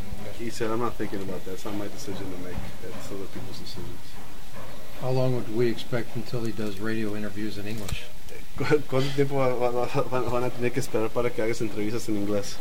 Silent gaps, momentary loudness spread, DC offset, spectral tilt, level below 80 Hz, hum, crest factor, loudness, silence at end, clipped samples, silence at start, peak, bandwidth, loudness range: none; 14 LU; 8%; -6 dB/octave; -46 dBFS; none; 20 dB; -30 LUFS; 0 s; under 0.1%; 0 s; -8 dBFS; 16.5 kHz; 10 LU